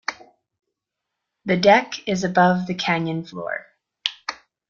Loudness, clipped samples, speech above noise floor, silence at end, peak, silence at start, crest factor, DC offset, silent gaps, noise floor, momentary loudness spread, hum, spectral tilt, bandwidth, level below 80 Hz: -21 LUFS; under 0.1%; 63 dB; 0.35 s; -2 dBFS; 0.1 s; 22 dB; under 0.1%; none; -82 dBFS; 16 LU; none; -5 dB/octave; 7.4 kHz; -62 dBFS